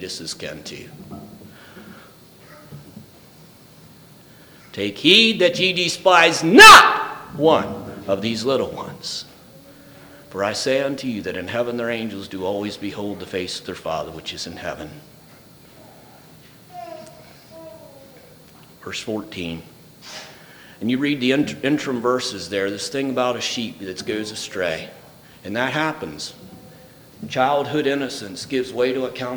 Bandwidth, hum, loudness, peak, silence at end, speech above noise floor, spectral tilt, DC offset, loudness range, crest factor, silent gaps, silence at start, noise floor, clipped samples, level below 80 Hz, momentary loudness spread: over 20 kHz; none; -18 LUFS; 0 dBFS; 0 s; 28 dB; -3 dB/octave; under 0.1%; 22 LU; 20 dB; none; 0 s; -47 dBFS; under 0.1%; -54 dBFS; 22 LU